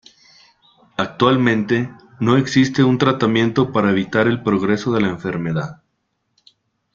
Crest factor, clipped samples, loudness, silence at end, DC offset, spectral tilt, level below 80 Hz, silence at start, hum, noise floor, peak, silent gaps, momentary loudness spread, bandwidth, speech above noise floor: 18 dB; under 0.1%; -18 LUFS; 1.2 s; under 0.1%; -6.5 dB/octave; -52 dBFS; 1 s; none; -71 dBFS; -2 dBFS; none; 10 LU; 7.4 kHz; 54 dB